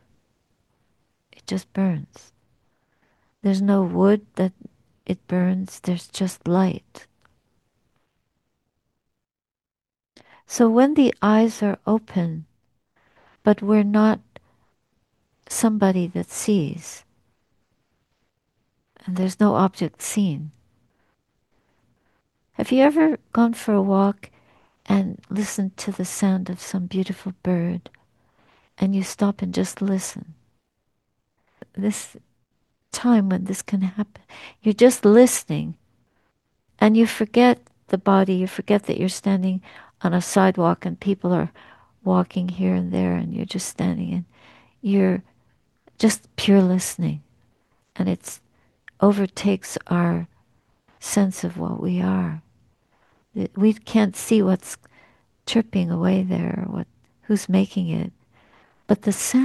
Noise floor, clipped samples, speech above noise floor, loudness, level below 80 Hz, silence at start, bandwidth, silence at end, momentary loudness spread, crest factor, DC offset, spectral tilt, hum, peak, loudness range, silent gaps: under -90 dBFS; under 0.1%; over 70 dB; -21 LUFS; -60 dBFS; 1.5 s; 12.5 kHz; 0 s; 14 LU; 22 dB; under 0.1%; -6 dB/octave; none; -2 dBFS; 7 LU; none